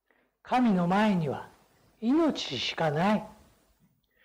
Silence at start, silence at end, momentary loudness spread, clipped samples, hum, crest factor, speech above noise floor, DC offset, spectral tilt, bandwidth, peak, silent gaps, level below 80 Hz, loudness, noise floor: 0.45 s; 0.9 s; 10 LU; under 0.1%; none; 10 dB; 42 dB; under 0.1%; -6 dB/octave; 12.5 kHz; -20 dBFS; none; -62 dBFS; -27 LUFS; -68 dBFS